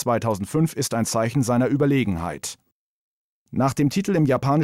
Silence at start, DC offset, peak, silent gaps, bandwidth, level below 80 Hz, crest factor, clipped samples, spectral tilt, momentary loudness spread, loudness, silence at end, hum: 0 s; under 0.1%; -10 dBFS; 2.72-3.46 s; 16 kHz; -54 dBFS; 12 dB; under 0.1%; -6 dB/octave; 9 LU; -22 LUFS; 0 s; none